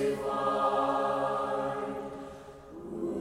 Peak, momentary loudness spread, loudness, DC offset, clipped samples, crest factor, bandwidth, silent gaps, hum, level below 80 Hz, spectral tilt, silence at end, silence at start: -16 dBFS; 18 LU; -31 LUFS; under 0.1%; under 0.1%; 16 dB; 15 kHz; none; none; -60 dBFS; -6 dB/octave; 0 s; 0 s